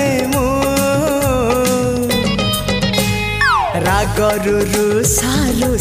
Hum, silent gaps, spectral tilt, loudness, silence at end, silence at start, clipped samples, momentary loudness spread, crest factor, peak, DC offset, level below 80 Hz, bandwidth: none; none; -4 dB/octave; -15 LUFS; 0 s; 0 s; under 0.1%; 3 LU; 14 dB; 0 dBFS; under 0.1%; -28 dBFS; 15.5 kHz